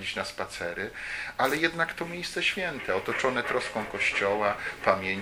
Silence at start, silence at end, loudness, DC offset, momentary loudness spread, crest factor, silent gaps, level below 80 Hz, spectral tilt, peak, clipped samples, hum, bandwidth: 0 s; 0 s; -28 LUFS; under 0.1%; 8 LU; 24 dB; none; -56 dBFS; -3.5 dB/octave; -6 dBFS; under 0.1%; none; 17 kHz